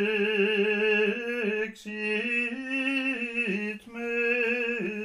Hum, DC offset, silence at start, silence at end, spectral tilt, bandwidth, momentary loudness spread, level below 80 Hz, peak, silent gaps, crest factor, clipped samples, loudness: none; under 0.1%; 0 s; 0 s; -5 dB/octave; 12.5 kHz; 8 LU; -70 dBFS; -14 dBFS; none; 14 dB; under 0.1%; -27 LUFS